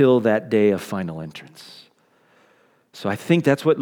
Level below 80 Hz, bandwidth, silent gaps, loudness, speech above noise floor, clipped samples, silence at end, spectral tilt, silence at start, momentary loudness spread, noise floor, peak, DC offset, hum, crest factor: -66 dBFS; 19.5 kHz; none; -20 LUFS; 40 dB; under 0.1%; 0 s; -7 dB/octave; 0 s; 23 LU; -59 dBFS; -4 dBFS; under 0.1%; none; 18 dB